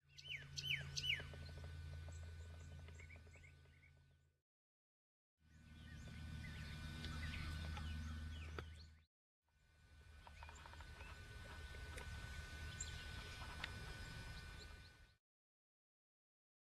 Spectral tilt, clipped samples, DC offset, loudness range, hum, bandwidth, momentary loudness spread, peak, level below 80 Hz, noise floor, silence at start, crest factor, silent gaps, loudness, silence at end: -3.5 dB/octave; under 0.1%; under 0.1%; 12 LU; none; 13.5 kHz; 19 LU; -30 dBFS; -58 dBFS; -73 dBFS; 0.05 s; 24 dB; 4.42-5.37 s, 9.07-9.42 s; -51 LUFS; 1.5 s